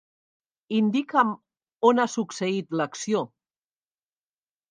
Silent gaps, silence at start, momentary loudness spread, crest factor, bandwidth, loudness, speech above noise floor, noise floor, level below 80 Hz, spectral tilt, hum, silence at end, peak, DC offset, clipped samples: none; 0.7 s; 8 LU; 22 dB; 9.8 kHz; -25 LUFS; over 66 dB; under -90 dBFS; -80 dBFS; -5 dB/octave; none; 1.45 s; -4 dBFS; under 0.1%; under 0.1%